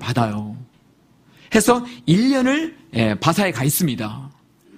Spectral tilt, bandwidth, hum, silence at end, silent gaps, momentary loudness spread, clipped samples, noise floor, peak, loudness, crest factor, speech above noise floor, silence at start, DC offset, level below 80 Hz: -5 dB/octave; 15.5 kHz; none; 0.45 s; none; 14 LU; under 0.1%; -55 dBFS; 0 dBFS; -19 LUFS; 20 dB; 37 dB; 0 s; under 0.1%; -52 dBFS